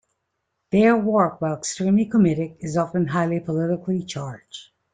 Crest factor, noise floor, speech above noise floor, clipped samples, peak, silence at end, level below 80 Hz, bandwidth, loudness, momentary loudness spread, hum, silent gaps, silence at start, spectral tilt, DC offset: 18 dB; -77 dBFS; 56 dB; under 0.1%; -4 dBFS; 0.3 s; -58 dBFS; 9.4 kHz; -22 LUFS; 14 LU; none; none; 0.7 s; -6.5 dB/octave; under 0.1%